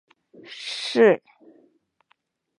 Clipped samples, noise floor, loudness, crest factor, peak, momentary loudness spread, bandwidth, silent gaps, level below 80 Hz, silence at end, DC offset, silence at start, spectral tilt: under 0.1%; -68 dBFS; -21 LUFS; 20 dB; -4 dBFS; 18 LU; 10.5 kHz; none; -84 dBFS; 1.4 s; under 0.1%; 0.5 s; -4.5 dB/octave